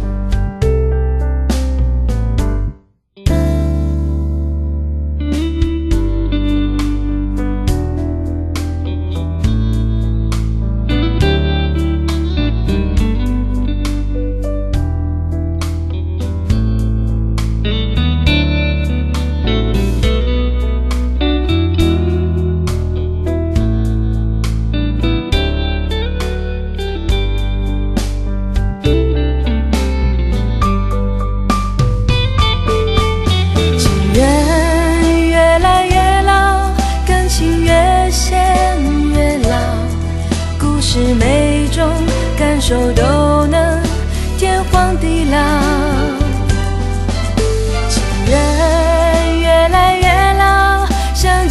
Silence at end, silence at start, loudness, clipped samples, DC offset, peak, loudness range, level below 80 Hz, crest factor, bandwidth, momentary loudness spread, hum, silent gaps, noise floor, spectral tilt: 0 s; 0 s; -15 LUFS; under 0.1%; under 0.1%; 0 dBFS; 6 LU; -16 dBFS; 14 dB; 13 kHz; 8 LU; none; none; -43 dBFS; -5.5 dB/octave